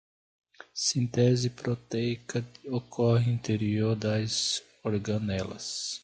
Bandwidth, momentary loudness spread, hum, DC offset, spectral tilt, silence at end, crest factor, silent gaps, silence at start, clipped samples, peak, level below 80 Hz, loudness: 9.4 kHz; 10 LU; none; under 0.1%; -5 dB/octave; 0.05 s; 18 dB; none; 0.75 s; under 0.1%; -12 dBFS; -58 dBFS; -29 LUFS